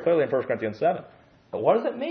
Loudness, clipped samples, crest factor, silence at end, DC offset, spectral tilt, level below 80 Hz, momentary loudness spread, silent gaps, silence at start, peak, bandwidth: -25 LUFS; under 0.1%; 18 dB; 0 s; under 0.1%; -8.5 dB/octave; -70 dBFS; 9 LU; none; 0 s; -6 dBFS; 6 kHz